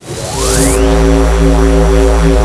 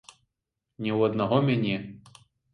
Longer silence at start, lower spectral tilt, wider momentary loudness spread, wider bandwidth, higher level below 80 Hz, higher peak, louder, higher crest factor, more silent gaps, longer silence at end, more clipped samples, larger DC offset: second, 0.05 s vs 0.8 s; second, -5.5 dB/octave vs -8 dB/octave; second, 3 LU vs 11 LU; about the same, 12 kHz vs 11 kHz; first, -12 dBFS vs -64 dBFS; first, 0 dBFS vs -8 dBFS; first, -10 LUFS vs -26 LUFS; second, 8 dB vs 20 dB; neither; second, 0 s vs 0.55 s; neither; neither